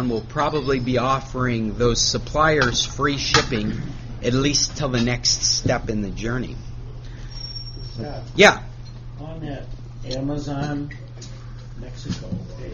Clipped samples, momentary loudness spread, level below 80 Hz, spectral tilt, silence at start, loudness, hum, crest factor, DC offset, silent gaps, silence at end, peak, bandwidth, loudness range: under 0.1%; 20 LU; -36 dBFS; -3.5 dB/octave; 0 s; -21 LUFS; none; 22 dB; under 0.1%; none; 0 s; 0 dBFS; 7.2 kHz; 11 LU